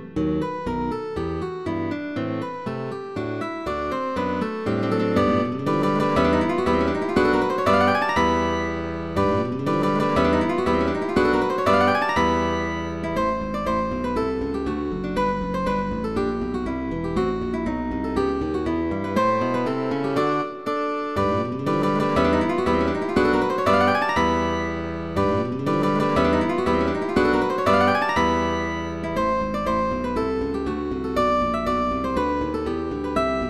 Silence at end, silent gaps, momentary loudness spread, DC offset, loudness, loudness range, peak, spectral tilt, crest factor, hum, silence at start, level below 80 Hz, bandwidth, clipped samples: 0 s; none; 8 LU; 0.5%; -23 LUFS; 5 LU; -6 dBFS; -6.5 dB/octave; 16 dB; none; 0 s; -40 dBFS; 14 kHz; under 0.1%